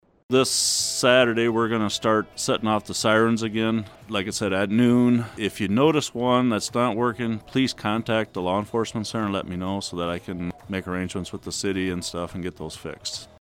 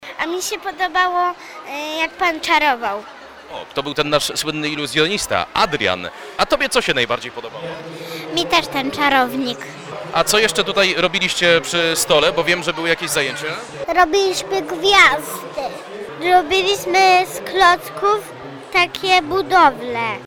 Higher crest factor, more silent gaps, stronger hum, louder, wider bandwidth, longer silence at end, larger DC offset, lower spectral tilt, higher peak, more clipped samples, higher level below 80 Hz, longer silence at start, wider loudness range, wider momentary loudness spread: about the same, 20 dB vs 18 dB; neither; neither; second, -23 LUFS vs -17 LUFS; second, 16.5 kHz vs 19 kHz; first, 0.15 s vs 0 s; neither; first, -4 dB/octave vs -2.5 dB/octave; second, -4 dBFS vs 0 dBFS; neither; second, -56 dBFS vs -48 dBFS; first, 0.3 s vs 0 s; first, 7 LU vs 4 LU; second, 12 LU vs 15 LU